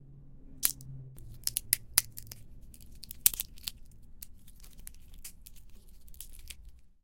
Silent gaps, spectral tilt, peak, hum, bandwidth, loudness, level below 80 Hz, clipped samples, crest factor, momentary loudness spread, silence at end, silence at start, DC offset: none; 0 dB/octave; 0 dBFS; none; 17 kHz; -30 LUFS; -52 dBFS; under 0.1%; 38 dB; 24 LU; 0.1 s; 0 s; under 0.1%